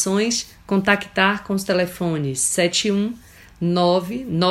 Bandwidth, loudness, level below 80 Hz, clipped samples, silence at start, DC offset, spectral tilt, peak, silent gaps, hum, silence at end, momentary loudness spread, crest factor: 16 kHz; -20 LUFS; -52 dBFS; under 0.1%; 0 s; under 0.1%; -4 dB/octave; 0 dBFS; none; none; 0 s; 7 LU; 20 dB